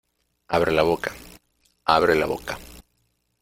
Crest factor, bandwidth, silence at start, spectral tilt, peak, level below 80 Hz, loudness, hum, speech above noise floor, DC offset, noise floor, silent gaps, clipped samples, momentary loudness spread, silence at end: 24 dB; 16.5 kHz; 0.5 s; -5 dB/octave; -2 dBFS; -48 dBFS; -22 LUFS; none; 49 dB; under 0.1%; -70 dBFS; none; under 0.1%; 16 LU; 0.6 s